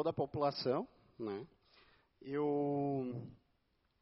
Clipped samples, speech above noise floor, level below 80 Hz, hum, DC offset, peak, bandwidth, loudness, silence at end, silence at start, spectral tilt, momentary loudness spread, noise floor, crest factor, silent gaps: under 0.1%; 41 dB; -74 dBFS; none; under 0.1%; -22 dBFS; 5.8 kHz; -39 LUFS; 0.65 s; 0 s; -6 dB/octave; 16 LU; -78 dBFS; 18 dB; none